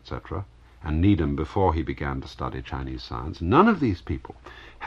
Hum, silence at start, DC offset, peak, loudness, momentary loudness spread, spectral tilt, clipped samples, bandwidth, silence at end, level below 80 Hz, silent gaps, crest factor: none; 0.05 s; under 0.1%; -4 dBFS; -25 LUFS; 18 LU; -8.5 dB/octave; under 0.1%; 7.2 kHz; 0 s; -38 dBFS; none; 22 dB